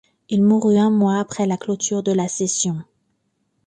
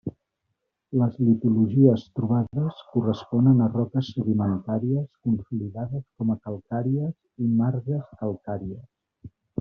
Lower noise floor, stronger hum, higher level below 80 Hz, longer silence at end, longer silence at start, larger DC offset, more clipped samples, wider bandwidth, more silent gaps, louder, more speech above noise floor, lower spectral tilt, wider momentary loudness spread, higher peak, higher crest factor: second, -69 dBFS vs -79 dBFS; neither; about the same, -62 dBFS vs -60 dBFS; first, 0.85 s vs 0.35 s; first, 0.3 s vs 0.05 s; neither; neither; first, 9.6 kHz vs 6.2 kHz; neither; first, -19 LUFS vs -25 LUFS; second, 51 dB vs 55 dB; second, -5.5 dB/octave vs -10 dB/octave; second, 7 LU vs 13 LU; about the same, -6 dBFS vs -4 dBFS; second, 14 dB vs 20 dB